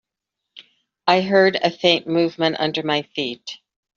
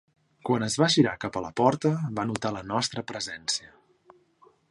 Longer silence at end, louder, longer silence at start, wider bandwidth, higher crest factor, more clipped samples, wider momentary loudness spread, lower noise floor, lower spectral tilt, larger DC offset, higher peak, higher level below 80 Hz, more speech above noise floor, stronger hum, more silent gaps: second, 0.4 s vs 1.05 s; first, -19 LUFS vs -27 LUFS; about the same, 0.55 s vs 0.45 s; second, 7.4 kHz vs 11.5 kHz; about the same, 18 dB vs 22 dB; neither; first, 13 LU vs 10 LU; first, -83 dBFS vs -61 dBFS; second, -2.5 dB/octave vs -4.5 dB/octave; neither; first, -2 dBFS vs -6 dBFS; about the same, -66 dBFS vs -62 dBFS; first, 63 dB vs 34 dB; neither; neither